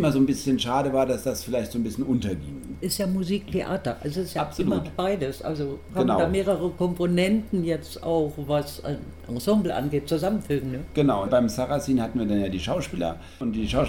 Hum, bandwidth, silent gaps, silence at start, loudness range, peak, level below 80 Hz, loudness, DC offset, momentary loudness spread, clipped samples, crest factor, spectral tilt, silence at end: none; 18 kHz; none; 0 s; 3 LU; -8 dBFS; -44 dBFS; -26 LUFS; 0.3%; 8 LU; under 0.1%; 16 dB; -6 dB/octave; 0 s